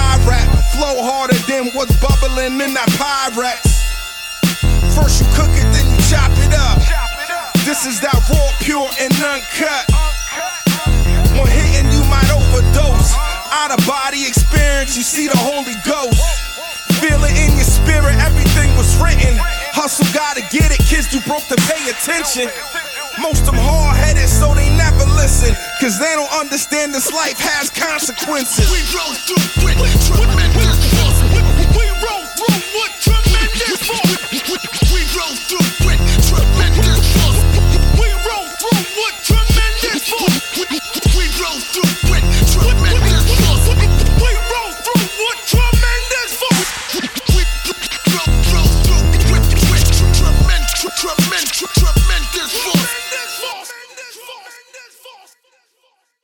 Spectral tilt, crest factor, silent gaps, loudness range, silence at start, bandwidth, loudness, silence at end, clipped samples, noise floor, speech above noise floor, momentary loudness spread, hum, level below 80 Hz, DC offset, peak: -4 dB/octave; 12 dB; none; 3 LU; 0 s; 19.5 kHz; -14 LUFS; 1.15 s; under 0.1%; -61 dBFS; 49 dB; 6 LU; none; -16 dBFS; under 0.1%; 0 dBFS